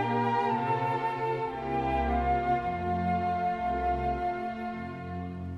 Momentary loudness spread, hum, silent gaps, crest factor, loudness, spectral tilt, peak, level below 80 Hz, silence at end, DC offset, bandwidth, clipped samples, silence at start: 9 LU; none; none; 14 dB; -30 LUFS; -8 dB/octave; -16 dBFS; -42 dBFS; 0 s; under 0.1%; 8.2 kHz; under 0.1%; 0 s